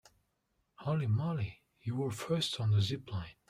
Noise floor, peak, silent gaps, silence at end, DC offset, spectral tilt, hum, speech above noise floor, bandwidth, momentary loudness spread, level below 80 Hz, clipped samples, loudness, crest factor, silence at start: -79 dBFS; -22 dBFS; none; 0.15 s; under 0.1%; -6 dB/octave; none; 46 dB; 13 kHz; 11 LU; -64 dBFS; under 0.1%; -35 LUFS; 14 dB; 0.8 s